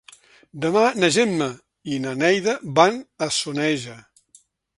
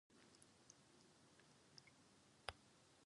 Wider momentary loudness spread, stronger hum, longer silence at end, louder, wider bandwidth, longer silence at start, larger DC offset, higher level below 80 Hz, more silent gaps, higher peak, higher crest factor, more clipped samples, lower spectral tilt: about the same, 11 LU vs 12 LU; neither; first, 0.75 s vs 0 s; first, -21 LUFS vs -62 LUFS; about the same, 11.5 kHz vs 11 kHz; first, 0.55 s vs 0.1 s; neither; first, -64 dBFS vs -80 dBFS; neither; first, 0 dBFS vs -26 dBFS; second, 22 dB vs 40 dB; neither; first, -4 dB/octave vs -2.5 dB/octave